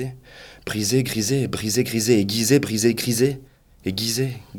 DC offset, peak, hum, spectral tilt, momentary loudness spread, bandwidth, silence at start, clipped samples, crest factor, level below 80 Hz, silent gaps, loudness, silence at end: under 0.1%; -4 dBFS; none; -4.5 dB/octave; 12 LU; 19 kHz; 0 s; under 0.1%; 18 dB; -52 dBFS; none; -21 LUFS; 0 s